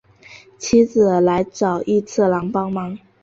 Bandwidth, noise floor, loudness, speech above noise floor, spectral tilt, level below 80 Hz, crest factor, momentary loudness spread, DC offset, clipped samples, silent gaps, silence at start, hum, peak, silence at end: 7.8 kHz; -45 dBFS; -18 LUFS; 28 dB; -6 dB/octave; -52 dBFS; 16 dB; 10 LU; under 0.1%; under 0.1%; none; 0.3 s; none; -4 dBFS; 0.25 s